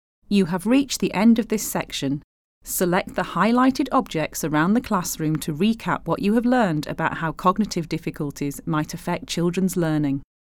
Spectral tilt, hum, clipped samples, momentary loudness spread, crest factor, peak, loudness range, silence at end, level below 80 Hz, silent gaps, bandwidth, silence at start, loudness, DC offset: -5.5 dB/octave; none; under 0.1%; 9 LU; 18 dB; -4 dBFS; 3 LU; 0.3 s; -48 dBFS; 2.24-2.61 s; 19 kHz; 0.3 s; -22 LUFS; under 0.1%